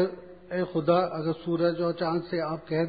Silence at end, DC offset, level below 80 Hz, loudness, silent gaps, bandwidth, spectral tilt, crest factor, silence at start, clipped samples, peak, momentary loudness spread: 0 s; 0.1%; -62 dBFS; -28 LUFS; none; 5 kHz; -11 dB/octave; 18 dB; 0 s; under 0.1%; -10 dBFS; 7 LU